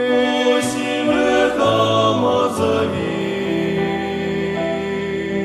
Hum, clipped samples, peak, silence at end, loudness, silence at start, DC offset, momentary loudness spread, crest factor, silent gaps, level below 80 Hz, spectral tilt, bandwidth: none; under 0.1%; -4 dBFS; 0 s; -18 LUFS; 0 s; under 0.1%; 6 LU; 14 dB; none; -50 dBFS; -5 dB/octave; 13.5 kHz